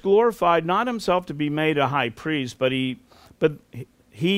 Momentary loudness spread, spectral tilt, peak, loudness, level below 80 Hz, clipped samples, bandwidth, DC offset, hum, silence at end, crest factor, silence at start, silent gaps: 19 LU; -6 dB/octave; -6 dBFS; -23 LUFS; -56 dBFS; under 0.1%; 16 kHz; under 0.1%; none; 0 s; 18 dB; 0.05 s; none